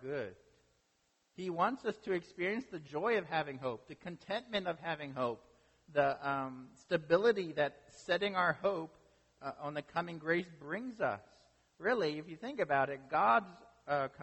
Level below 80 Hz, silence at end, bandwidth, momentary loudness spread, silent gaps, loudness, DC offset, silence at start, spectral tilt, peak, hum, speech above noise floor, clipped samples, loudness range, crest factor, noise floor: -74 dBFS; 0 s; 8.4 kHz; 14 LU; none; -36 LUFS; under 0.1%; 0 s; -6 dB/octave; -16 dBFS; none; 41 dB; under 0.1%; 4 LU; 22 dB; -77 dBFS